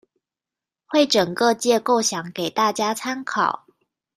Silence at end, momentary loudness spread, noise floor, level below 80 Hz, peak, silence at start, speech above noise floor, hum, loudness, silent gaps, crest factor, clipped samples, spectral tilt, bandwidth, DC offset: 0.6 s; 8 LU; -89 dBFS; -68 dBFS; -4 dBFS; 0.9 s; 68 dB; none; -21 LUFS; none; 18 dB; under 0.1%; -3 dB/octave; 15 kHz; under 0.1%